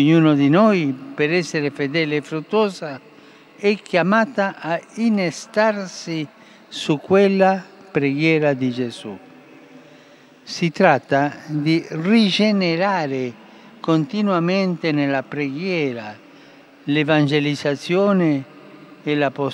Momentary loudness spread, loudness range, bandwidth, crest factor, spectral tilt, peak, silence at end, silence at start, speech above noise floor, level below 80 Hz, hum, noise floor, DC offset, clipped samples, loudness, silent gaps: 12 LU; 3 LU; 11.5 kHz; 20 dB; -6.5 dB/octave; 0 dBFS; 0 s; 0 s; 29 dB; -76 dBFS; none; -48 dBFS; under 0.1%; under 0.1%; -19 LUFS; none